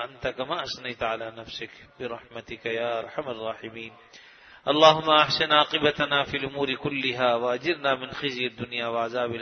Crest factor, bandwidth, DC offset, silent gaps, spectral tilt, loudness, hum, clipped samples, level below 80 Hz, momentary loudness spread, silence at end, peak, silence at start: 24 dB; 6.6 kHz; under 0.1%; none; -4.5 dB/octave; -25 LUFS; none; under 0.1%; -60 dBFS; 17 LU; 0 s; -2 dBFS; 0 s